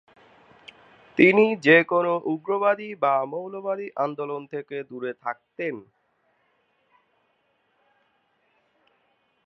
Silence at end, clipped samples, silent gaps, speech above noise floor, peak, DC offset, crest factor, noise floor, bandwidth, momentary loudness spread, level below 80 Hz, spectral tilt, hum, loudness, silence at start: 3.65 s; under 0.1%; none; 46 dB; -2 dBFS; under 0.1%; 24 dB; -69 dBFS; 7.6 kHz; 17 LU; -76 dBFS; -7 dB/octave; none; -23 LUFS; 1.15 s